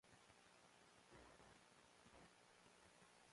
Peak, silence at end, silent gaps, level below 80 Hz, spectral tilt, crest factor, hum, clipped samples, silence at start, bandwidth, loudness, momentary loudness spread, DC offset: -50 dBFS; 0 s; none; -84 dBFS; -3 dB/octave; 18 dB; none; under 0.1%; 0.05 s; 11.5 kHz; -69 LUFS; 3 LU; under 0.1%